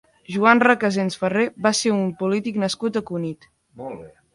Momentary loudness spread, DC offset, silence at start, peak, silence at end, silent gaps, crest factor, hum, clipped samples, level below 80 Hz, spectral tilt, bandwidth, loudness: 20 LU; under 0.1%; 0.3 s; 0 dBFS; 0.25 s; none; 22 dB; none; under 0.1%; -62 dBFS; -4.5 dB/octave; 11.5 kHz; -20 LUFS